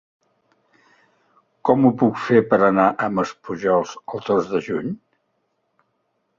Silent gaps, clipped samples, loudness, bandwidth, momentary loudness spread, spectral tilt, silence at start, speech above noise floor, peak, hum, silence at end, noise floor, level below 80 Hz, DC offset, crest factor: none; under 0.1%; -20 LUFS; 7.4 kHz; 12 LU; -7.5 dB/octave; 1.65 s; 52 dB; -2 dBFS; none; 1.4 s; -71 dBFS; -60 dBFS; under 0.1%; 20 dB